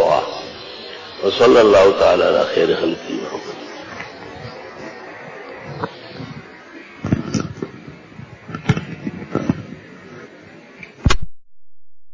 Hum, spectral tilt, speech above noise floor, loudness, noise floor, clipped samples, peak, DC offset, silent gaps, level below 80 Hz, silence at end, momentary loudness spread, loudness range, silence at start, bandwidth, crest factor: none; -5.5 dB/octave; 37 dB; -17 LUFS; -51 dBFS; under 0.1%; -2 dBFS; under 0.1%; none; -36 dBFS; 0 s; 26 LU; 16 LU; 0 s; 7.6 kHz; 16 dB